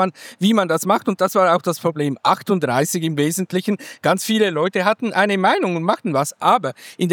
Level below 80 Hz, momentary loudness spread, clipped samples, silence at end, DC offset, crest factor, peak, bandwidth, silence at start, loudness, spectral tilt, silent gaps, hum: -86 dBFS; 5 LU; under 0.1%; 0 s; under 0.1%; 18 dB; -2 dBFS; 19 kHz; 0 s; -19 LUFS; -5 dB/octave; none; none